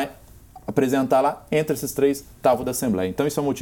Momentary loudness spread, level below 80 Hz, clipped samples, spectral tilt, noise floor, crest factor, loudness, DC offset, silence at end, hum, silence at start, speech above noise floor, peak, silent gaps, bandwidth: 6 LU; -52 dBFS; under 0.1%; -5.5 dB/octave; -46 dBFS; 18 dB; -22 LUFS; under 0.1%; 0 s; none; 0 s; 24 dB; -4 dBFS; none; 18.5 kHz